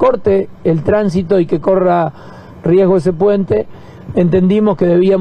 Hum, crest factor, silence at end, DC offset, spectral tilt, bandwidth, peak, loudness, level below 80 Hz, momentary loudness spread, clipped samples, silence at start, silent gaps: none; 12 dB; 0 s; under 0.1%; -9 dB/octave; 9.2 kHz; 0 dBFS; -13 LUFS; -42 dBFS; 6 LU; under 0.1%; 0 s; none